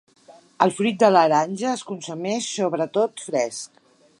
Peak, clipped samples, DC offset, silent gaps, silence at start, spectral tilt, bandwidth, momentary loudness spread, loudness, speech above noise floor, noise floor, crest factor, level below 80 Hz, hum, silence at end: 0 dBFS; under 0.1%; under 0.1%; none; 0.6 s; -4.5 dB/octave; 11.5 kHz; 13 LU; -22 LUFS; 30 dB; -51 dBFS; 22 dB; -74 dBFS; none; 0.55 s